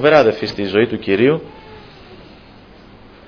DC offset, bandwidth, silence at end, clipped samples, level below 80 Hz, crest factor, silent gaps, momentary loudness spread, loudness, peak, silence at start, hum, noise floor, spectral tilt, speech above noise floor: under 0.1%; 5.4 kHz; 1.15 s; under 0.1%; -48 dBFS; 18 dB; none; 25 LU; -16 LUFS; 0 dBFS; 0 s; none; -42 dBFS; -7 dB/octave; 27 dB